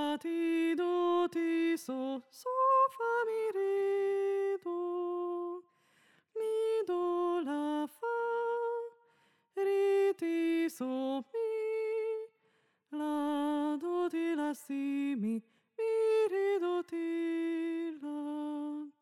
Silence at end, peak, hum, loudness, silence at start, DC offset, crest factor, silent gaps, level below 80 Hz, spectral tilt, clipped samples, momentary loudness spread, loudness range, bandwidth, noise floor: 0.1 s; -18 dBFS; none; -34 LUFS; 0 s; under 0.1%; 14 dB; none; under -90 dBFS; -5 dB/octave; under 0.1%; 10 LU; 4 LU; 14 kHz; -74 dBFS